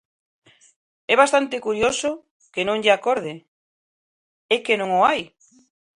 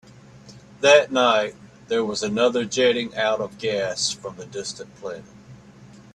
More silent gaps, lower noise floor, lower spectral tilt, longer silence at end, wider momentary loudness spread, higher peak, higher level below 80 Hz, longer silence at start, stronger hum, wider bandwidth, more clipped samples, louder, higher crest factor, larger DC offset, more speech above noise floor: first, 2.31-2.40 s, 3.48-4.49 s vs none; first, under -90 dBFS vs -46 dBFS; about the same, -3 dB/octave vs -3 dB/octave; first, 0.7 s vs 0.15 s; about the same, 18 LU vs 19 LU; about the same, -2 dBFS vs 0 dBFS; about the same, -60 dBFS vs -62 dBFS; first, 1.1 s vs 0.35 s; neither; about the same, 11 kHz vs 11 kHz; neither; about the same, -20 LUFS vs -21 LUFS; about the same, 22 dB vs 22 dB; neither; first, over 70 dB vs 25 dB